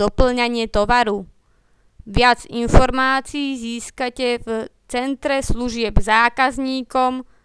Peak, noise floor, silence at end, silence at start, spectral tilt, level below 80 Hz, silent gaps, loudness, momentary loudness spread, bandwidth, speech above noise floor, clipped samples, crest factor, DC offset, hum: 0 dBFS; -57 dBFS; 0.2 s; 0 s; -5 dB/octave; -28 dBFS; none; -19 LUFS; 10 LU; 11 kHz; 39 dB; under 0.1%; 18 dB; under 0.1%; none